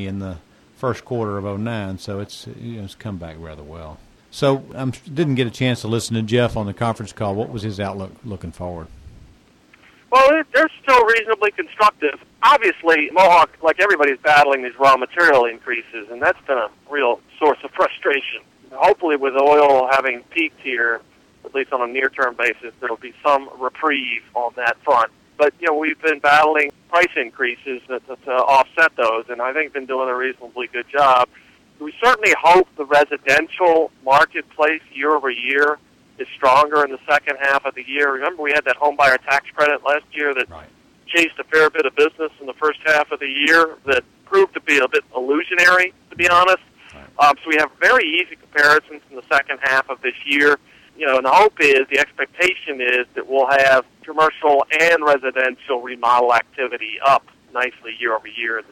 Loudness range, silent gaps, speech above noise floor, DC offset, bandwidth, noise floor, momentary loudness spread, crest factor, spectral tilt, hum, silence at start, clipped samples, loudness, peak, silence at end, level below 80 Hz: 7 LU; none; 34 dB; under 0.1%; 16.5 kHz; -52 dBFS; 14 LU; 14 dB; -4.5 dB/octave; none; 0 s; under 0.1%; -17 LUFS; -4 dBFS; 0.1 s; -54 dBFS